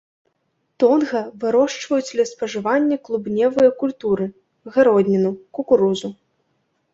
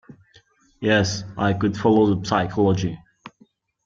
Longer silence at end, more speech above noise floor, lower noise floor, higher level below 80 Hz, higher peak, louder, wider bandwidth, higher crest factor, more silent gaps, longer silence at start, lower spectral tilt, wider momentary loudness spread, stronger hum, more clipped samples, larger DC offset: first, 0.8 s vs 0.6 s; first, 52 dB vs 38 dB; first, -70 dBFS vs -58 dBFS; second, -62 dBFS vs -52 dBFS; first, -2 dBFS vs -6 dBFS; about the same, -19 LUFS vs -21 LUFS; about the same, 7.8 kHz vs 7.6 kHz; about the same, 18 dB vs 18 dB; neither; first, 0.8 s vs 0.1 s; about the same, -6 dB/octave vs -6 dB/octave; about the same, 8 LU vs 9 LU; neither; neither; neither